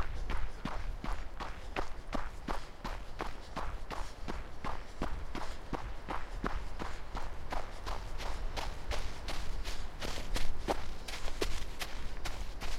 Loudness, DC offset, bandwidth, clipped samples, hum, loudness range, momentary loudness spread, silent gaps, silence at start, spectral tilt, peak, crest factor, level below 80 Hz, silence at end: -42 LUFS; under 0.1%; 13 kHz; under 0.1%; none; 2 LU; 5 LU; none; 0 s; -4.5 dB/octave; -16 dBFS; 16 dB; -40 dBFS; 0 s